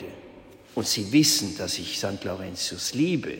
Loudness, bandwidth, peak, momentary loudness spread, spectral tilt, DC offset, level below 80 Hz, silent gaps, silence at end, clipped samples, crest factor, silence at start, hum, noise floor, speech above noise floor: -25 LUFS; 16.5 kHz; -8 dBFS; 13 LU; -3.5 dB/octave; under 0.1%; -60 dBFS; none; 0 s; under 0.1%; 18 dB; 0 s; none; -48 dBFS; 22 dB